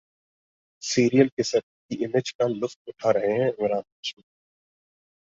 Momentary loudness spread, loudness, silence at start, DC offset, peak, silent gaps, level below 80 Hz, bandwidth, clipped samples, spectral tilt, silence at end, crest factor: 14 LU; -25 LUFS; 0.8 s; under 0.1%; -4 dBFS; 1.32-1.37 s, 1.63-1.89 s, 2.35-2.39 s, 2.76-2.85 s, 3.92-4.03 s; -66 dBFS; 7.8 kHz; under 0.1%; -5 dB/octave; 1.15 s; 22 dB